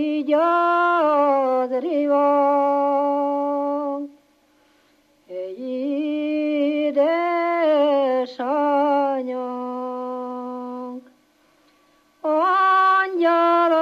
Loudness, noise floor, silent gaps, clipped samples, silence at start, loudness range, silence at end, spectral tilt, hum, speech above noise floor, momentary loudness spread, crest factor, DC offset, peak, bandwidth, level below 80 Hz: -20 LUFS; -59 dBFS; none; under 0.1%; 0 s; 8 LU; 0 s; -4.5 dB/octave; none; 41 dB; 14 LU; 12 dB; under 0.1%; -8 dBFS; 6.8 kHz; -80 dBFS